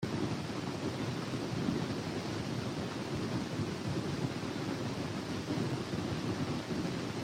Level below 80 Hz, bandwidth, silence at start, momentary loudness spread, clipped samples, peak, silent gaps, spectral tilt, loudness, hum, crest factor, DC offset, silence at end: -60 dBFS; 16 kHz; 0 s; 2 LU; under 0.1%; -20 dBFS; none; -6 dB/octave; -37 LUFS; none; 16 dB; under 0.1%; 0 s